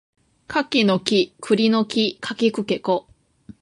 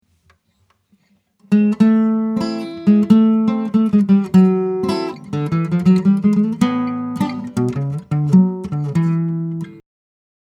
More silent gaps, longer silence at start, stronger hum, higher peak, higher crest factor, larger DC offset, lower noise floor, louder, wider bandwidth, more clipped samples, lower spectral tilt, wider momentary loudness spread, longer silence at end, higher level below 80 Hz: neither; second, 0.5 s vs 1.5 s; neither; about the same, -2 dBFS vs 0 dBFS; about the same, 20 dB vs 16 dB; neither; second, -47 dBFS vs -62 dBFS; second, -21 LUFS vs -16 LUFS; about the same, 11.5 kHz vs 10.5 kHz; neither; second, -5 dB/octave vs -8.5 dB/octave; second, 6 LU vs 11 LU; about the same, 0.6 s vs 0.65 s; second, -62 dBFS vs -54 dBFS